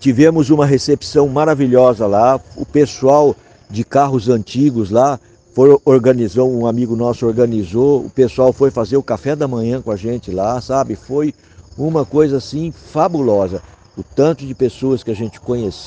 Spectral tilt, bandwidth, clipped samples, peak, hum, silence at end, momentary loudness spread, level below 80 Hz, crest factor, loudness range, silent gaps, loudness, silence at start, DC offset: -7.5 dB/octave; 9.2 kHz; under 0.1%; 0 dBFS; none; 0 s; 11 LU; -44 dBFS; 14 dB; 5 LU; none; -15 LUFS; 0 s; under 0.1%